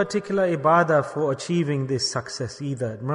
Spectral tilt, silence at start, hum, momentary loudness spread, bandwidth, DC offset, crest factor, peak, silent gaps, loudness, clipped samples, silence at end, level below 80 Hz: -5.5 dB/octave; 0 s; none; 10 LU; 10.5 kHz; under 0.1%; 18 dB; -6 dBFS; none; -23 LUFS; under 0.1%; 0 s; -62 dBFS